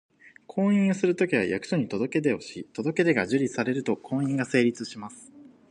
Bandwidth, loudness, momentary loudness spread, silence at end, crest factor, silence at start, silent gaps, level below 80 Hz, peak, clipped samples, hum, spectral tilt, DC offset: 10.5 kHz; -26 LUFS; 12 LU; 0.3 s; 18 dB; 0.55 s; none; -66 dBFS; -8 dBFS; under 0.1%; none; -6.5 dB/octave; under 0.1%